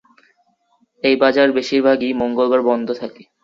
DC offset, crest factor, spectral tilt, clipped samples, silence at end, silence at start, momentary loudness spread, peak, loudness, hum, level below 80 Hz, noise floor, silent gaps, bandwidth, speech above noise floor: under 0.1%; 16 dB; -5 dB/octave; under 0.1%; 0.2 s; 1.05 s; 10 LU; -2 dBFS; -17 LUFS; none; -60 dBFS; -62 dBFS; none; 7.6 kHz; 46 dB